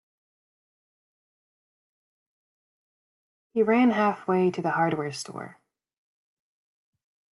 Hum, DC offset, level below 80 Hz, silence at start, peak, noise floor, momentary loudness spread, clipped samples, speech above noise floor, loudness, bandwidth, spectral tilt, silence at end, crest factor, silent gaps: none; under 0.1%; -76 dBFS; 3.55 s; -10 dBFS; under -90 dBFS; 16 LU; under 0.1%; over 66 dB; -24 LUFS; 12 kHz; -6 dB/octave; 1.8 s; 20 dB; none